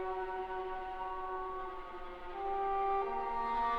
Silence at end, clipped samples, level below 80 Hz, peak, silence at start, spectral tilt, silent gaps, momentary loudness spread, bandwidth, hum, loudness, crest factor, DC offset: 0 s; under 0.1%; -52 dBFS; -22 dBFS; 0 s; -6 dB/octave; none; 11 LU; 7.2 kHz; none; -38 LUFS; 14 dB; under 0.1%